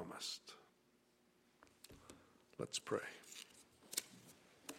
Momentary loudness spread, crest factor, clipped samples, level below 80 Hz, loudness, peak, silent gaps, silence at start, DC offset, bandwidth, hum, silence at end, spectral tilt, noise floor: 19 LU; 32 dB; under 0.1%; -82 dBFS; -47 LUFS; -20 dBFS; none; 0 s; under 0.1%; 16 kHz; none; 0 s; -2 dB/octave; -75 dBFS